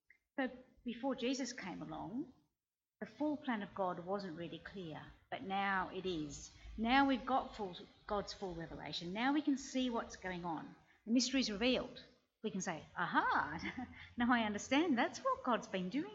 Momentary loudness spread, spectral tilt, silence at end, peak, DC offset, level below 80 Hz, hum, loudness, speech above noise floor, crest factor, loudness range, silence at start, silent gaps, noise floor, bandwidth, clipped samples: 15 LU; -4 dB/octave; 0 s; -16 dBFS; under 0.1%; -66 dBFS; none; -39 LUFS; over 51 dB; 22 dB; 7 LU; 0.4 s; none; under -90 dBFS; 8 kHz; under 0.1%